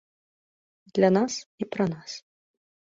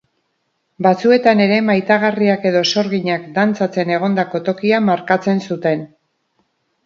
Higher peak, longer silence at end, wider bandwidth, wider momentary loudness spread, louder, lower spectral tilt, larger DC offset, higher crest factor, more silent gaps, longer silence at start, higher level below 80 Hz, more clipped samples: second, -8 dBFS vs 0 dBFS; second, 0.8 s vs 1 s; about the same, 7.8 kHz vs 7.2 kHz; first, 17 LU vs 7 LU; second, -26 LUFS vs -16 LUFS; about the same, -5.5 dB/octave vs -6 dB/octave; neither; first, 22 dB vs 16 dB; first, 1.46-1.58 s vs none; first, 0.95 s vs 0.8 s; about the same, -68 dBFS vs -64 dBFS; neither